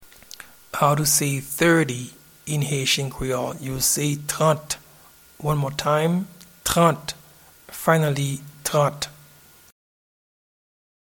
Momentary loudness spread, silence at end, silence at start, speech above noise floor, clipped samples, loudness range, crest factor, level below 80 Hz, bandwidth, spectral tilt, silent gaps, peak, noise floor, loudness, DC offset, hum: 17 LU; 1.9 s; 0 s; 29 dB; under 0.1%; 4 LU; 22 dB; -50 dBFS; 19 kHz; -4 dB/octave; none; -2 dBFS; -51 dBFS; -22 LUFS; under 0.1%; none